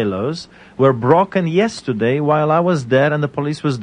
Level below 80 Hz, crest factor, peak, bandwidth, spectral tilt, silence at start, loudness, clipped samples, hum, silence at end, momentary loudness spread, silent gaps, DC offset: -56 dBFS; 16 dB; 0 dBFS; 10 kHz; -7 dB/octave; 0 s; -16 LUFS; under 0.1%; none; 0 s; 8 LU; none; under 0.1%